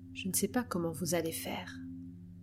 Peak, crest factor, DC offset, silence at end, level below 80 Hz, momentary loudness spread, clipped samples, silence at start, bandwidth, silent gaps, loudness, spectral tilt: -18 dBFS; 18 dB; under 0.1%; 0 s; -66 dBFS; 14 LU; under 0.1%; 0 s; 16.5 kHz; none; -35 LUFS; -4 dB/octave